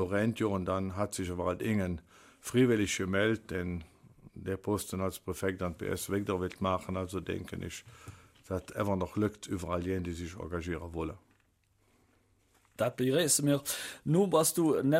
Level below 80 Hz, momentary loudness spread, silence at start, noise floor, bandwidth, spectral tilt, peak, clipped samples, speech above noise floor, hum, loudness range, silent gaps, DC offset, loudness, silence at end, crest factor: -56 dBFS; 14 LU; 0 s; -71 dBFS; 16 kHz; -5 dB/octave; -14 dBFS; under 0.1%; 39 dB; none; 6 LU; none; under 0.1%; -32 LUFS; 0 s; 18 dB